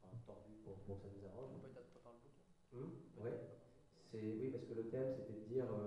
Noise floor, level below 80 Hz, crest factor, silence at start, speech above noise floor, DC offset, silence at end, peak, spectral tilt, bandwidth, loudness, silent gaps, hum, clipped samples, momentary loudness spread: -70 dBFS; -74 dBFS; 18 dB; 0 s; 24 dB; under 0.1%; 0 s; -32 dBFS; -9 dB/octave; 11 kHz; -50 LUFS; none; none; under 0.1%; 19 LU